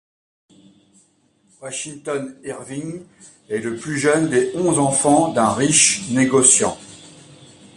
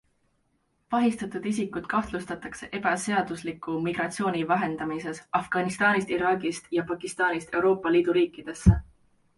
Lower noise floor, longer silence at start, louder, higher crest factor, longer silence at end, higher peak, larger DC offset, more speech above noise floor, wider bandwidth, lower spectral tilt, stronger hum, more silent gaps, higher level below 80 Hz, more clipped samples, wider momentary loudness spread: second, -60 dBFS vs -72 dBFS; first, 1.6 s vs 0.9 s; first, -17 LUFS vs -27 LUFS; about the same, 20 dB vs 22 dB; about the same, 0.65 s vs 0.55 s; first, 0 dBFS vs -4 dBFS; neither; second, 41 dB vs 45 dB; about the same, 11.5 kHz vs 11.5 kHz; second, -3 dB/octave vs -6 dB/octave; neither; neither; second, -58 dBFS vs -42 dBFS; neither; first, 18 LU vs 10 LU